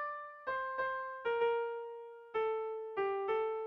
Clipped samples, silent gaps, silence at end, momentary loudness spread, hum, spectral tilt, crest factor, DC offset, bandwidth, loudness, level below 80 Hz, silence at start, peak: under 0.1%; none; 0 s; 9 LU; none; -5.5 dB/octave; 14 dB; under 0.1%; 5.4 kHz; -37 LUFS; -76 dBFS; 0 s; -24 dBFS